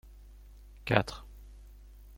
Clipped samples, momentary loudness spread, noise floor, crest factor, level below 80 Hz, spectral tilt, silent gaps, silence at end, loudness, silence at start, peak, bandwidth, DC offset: under 0.1%; 26 LU; -52 dBFS; 32 dB; -50 dBFS; -6 dB/octave; none; 0 s; -31 LUFS; 0.05 s; -4 dBFS; 16.5 kHz; under 0.1%